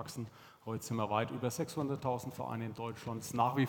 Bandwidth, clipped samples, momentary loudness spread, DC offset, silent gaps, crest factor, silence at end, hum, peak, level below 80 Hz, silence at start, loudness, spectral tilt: 18.5 kHz; under 0.1%; 10 LU; under 0.1%; none; 20 dB; 0 s; none; -16 dBFS; -72 dBFS; 0 s; -38 LUFS; -6 dB/octave